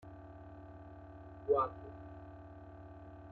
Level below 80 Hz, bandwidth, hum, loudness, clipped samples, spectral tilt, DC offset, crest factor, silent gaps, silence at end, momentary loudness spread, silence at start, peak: -62 dBFS; 4.4 kHz; none; -38 LUFS; under 0.1%; -7.5 dB/octave; under 0.1%; 22 dB; none; 0 s; 20 LU; 0 s; -20 dBFS